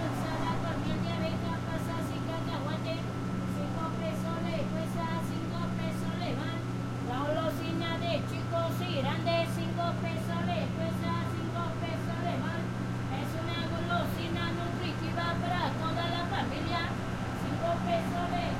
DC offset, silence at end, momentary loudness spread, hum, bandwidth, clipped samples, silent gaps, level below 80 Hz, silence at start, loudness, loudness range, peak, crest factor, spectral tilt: under 0.1%; 0 s; 3 LU; none; 16 kHz; under 0.1%; none; -52 dBFS; 0 s; -33 LUFS; 2 LU; -18 dBFS; 14 dB; -6.5 dB/octave